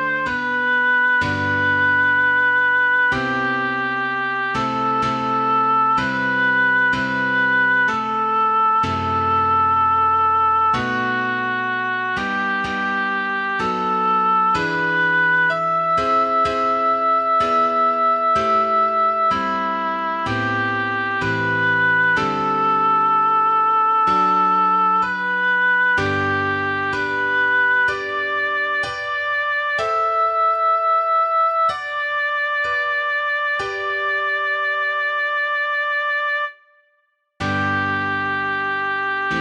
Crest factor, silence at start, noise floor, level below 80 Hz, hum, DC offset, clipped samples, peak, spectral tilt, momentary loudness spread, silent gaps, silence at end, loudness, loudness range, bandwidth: 10 dB; 0 s; -66 dBFS; -54 dBFS; none; under 0.1%; under 0.1%; -8 dBFS; -5 dB/octave; 5 LU; none; 0 s; -18 LUFS; 4 LU; 9.4 kHz